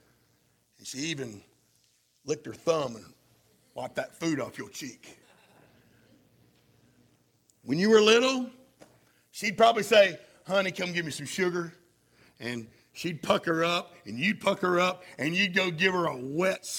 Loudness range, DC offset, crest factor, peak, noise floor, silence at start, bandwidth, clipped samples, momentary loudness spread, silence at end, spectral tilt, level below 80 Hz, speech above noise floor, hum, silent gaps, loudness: 13 LU; under 0.1%; 22 dB; -8 dBFS; -69 dBFS; 0.85 s; 17.5 kHz; under 0.1%; 19 LU; 0 s; -4 dB/octave; -72 dBFS; 41 dB; none; none; -27 LUFS